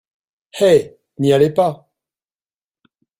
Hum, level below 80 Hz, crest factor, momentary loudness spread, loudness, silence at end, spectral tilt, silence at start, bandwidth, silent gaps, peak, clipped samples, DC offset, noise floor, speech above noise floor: none; -56 dBFS; 16 dB; 21 LU; -16 LUFS; 1.45 s; -6 dB/octave; 0.55 s; 16 kHz; none; -2 dBFS; under 0.1%; under 0.1%; under -90 dBFS; over 76 dB